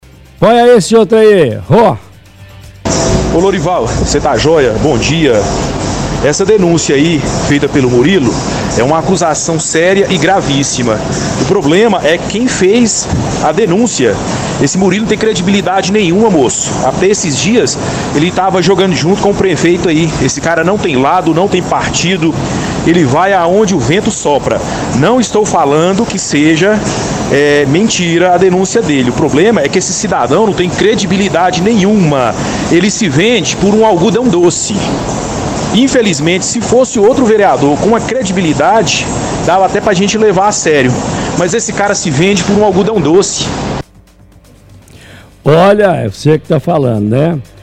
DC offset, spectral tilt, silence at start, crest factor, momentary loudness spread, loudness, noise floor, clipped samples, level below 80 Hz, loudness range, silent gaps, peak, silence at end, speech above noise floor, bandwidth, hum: under 0.1%; -4.5 dB/octave; 0.4 s; 10 dB; 5 LU; -10 LUFS; -40 dBFS; 0.3%; -32 dBFS; 2 LU; none; 0 dBFS; 0.2 s; 31 dB; 14 kHz; none